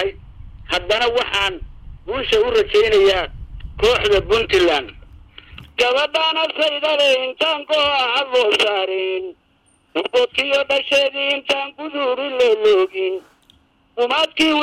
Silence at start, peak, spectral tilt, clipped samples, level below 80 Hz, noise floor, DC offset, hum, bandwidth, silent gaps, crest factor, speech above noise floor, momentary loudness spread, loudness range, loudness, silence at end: 0 s; -6 dBFS; -3 dB/octave; under 0.1%; -40 dBFS; -59 dBFS; under 0.1%; none; 14.5 kHz; none; 12 dB; 41 dB; 12 LU; 2 LU; -17 LUFS; 0 s